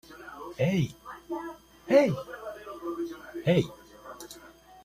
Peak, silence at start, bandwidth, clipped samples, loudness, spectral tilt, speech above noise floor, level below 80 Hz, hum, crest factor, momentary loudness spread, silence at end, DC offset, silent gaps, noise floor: -8 dBFS; 0.1 s; 15 kHz; under 0.1%; -29 LUFS; -7 dB/octave; 27 dB; -60 dBFS; none; 22 dB; 22 LU; 0.05 s; under 0.1%; none; -52 dBFS